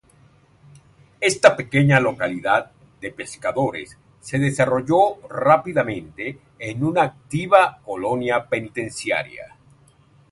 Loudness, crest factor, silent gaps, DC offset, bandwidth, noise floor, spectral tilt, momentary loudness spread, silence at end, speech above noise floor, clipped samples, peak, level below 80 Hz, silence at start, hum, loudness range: -20 LUFS; 22 dB; none; under 0.1%; 11.5 kHz; -54 dBFS; -5.5 dB/octave; 16 LU; 0.85 s; 34 dB; under 0.1%; 0 dBFS; -56 dBFS; 1.2 s; none; 2 LU